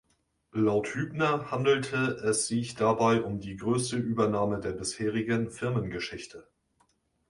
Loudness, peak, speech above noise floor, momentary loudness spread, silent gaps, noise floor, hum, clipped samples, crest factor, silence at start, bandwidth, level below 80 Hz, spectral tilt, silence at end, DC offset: -29 LUFS; -12 dBFS; 43 dB; 9 LU; none; -72 dBFS; none; under 0.1%; 18 dB; 0.55 s; 11.5 kHz; -58 dBFS; -5 dB/octave; 0.9 s; under 0.1%